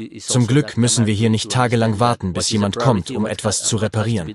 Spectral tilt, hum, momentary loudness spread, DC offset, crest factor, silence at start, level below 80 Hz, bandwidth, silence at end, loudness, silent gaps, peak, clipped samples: -5 dB/octave; none; 4 LU; under 0.1%; 16 dB; 0 s; -52 dBFS; 12.5 kHz; 0 s; -18 LUFS; none; -2 dBFS; under 0.1%